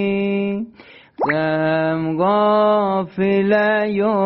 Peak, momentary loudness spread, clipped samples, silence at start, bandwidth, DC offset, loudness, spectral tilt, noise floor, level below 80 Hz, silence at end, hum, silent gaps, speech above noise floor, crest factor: -6 dBFS; 7 LU; under 0.1%; 0 s; 5.8 kHz; under 0.1%; -18 LUFS; -5 dB/octave; -45 dBFS; -58 dBFS; 0 s; none; none; 28 dB; 12 dB